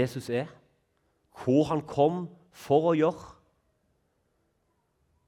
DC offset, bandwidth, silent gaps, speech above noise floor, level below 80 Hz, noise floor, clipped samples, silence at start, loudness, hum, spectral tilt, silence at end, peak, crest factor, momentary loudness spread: under 0.1%; 15.5 kHz; none; 47 dB; -66 dBFS; -74 dBFS; under 0.1%; 0 s; -27 LUFS; none; -7.5 dB/octave; 1.95 s; -10 dBFS; 20 dB; 15 LU